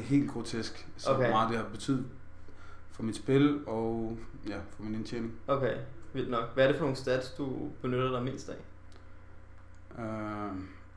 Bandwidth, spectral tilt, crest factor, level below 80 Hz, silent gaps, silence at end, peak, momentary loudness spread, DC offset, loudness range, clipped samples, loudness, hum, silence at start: 11 kHz; -6.5 dB/octave; 18 dB; -54 dBFS; none; 0 s; -14 dBFS; 15 LU; under 0.1%; 5 LU; under 0.1%; -33 LUFS; none; 0 s